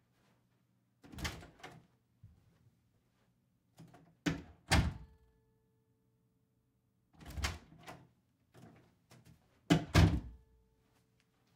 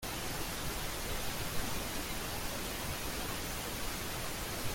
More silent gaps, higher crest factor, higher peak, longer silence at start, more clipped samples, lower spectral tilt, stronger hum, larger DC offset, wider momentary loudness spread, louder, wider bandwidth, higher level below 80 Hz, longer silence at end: neither; first, 28 dB vs 16 dB; first, -14 dBFS vs -22 dBFS; first, 1.15 s vs 0 s; neither; first, -5.5 dB/octave vs -3 dB/octave; neither; neither; first, 26 LU vs 1 LU; first, -35 LUFS vs -38 LUFS; about the same, 16 kHz vs 17 kHz; about the same, -48 dBFS vs -46 dBFS; first, 1.2 s vs 0 s